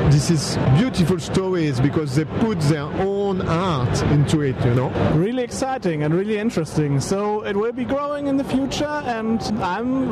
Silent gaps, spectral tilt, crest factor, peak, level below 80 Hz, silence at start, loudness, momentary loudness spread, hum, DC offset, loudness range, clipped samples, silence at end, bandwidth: none; -6.5 dB/octave; 14 dB; -6 dBFS; -40 dBFS; 0 s; -21 LUFS; 5 LU; none; under 0.1%; 2 LU; under 0.1%; 0 s; 13 kHz